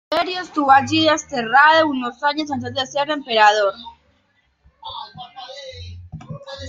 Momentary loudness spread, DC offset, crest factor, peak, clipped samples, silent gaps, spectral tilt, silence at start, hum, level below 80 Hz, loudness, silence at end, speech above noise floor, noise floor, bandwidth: 23 LU; under 0.1%; 18 dB; -2 dBFS; under 0.1%; none; -3.5 dB/octave; 0.1 s; none; -56 dBFS; -17 LUFS; 0 s; 45 dB; -63 dBFS; 7.8 kHz